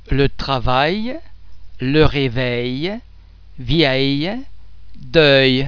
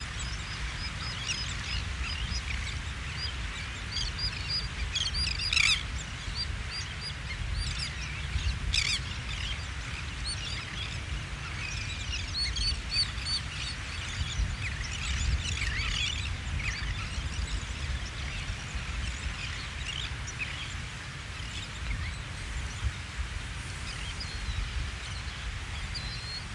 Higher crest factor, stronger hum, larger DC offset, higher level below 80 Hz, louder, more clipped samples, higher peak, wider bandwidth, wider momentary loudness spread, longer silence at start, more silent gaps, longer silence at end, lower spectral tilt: about the same, 18 dB vs 22 dB; neither; neither; first, -32 dBFS vs -38 dBFS; first, -17 LUFS vs -33 LUFS; neither; first, 0 dBFS vs -12 dBFS; second, 5.4 kHz vs 11.5 kHz; first, 16 LU vs 8 LU; about the same, 0 s vs 0 s; neither; about the same, 0 s vs 0 s; first, -7 dB/octave vs -2.5 dB/octave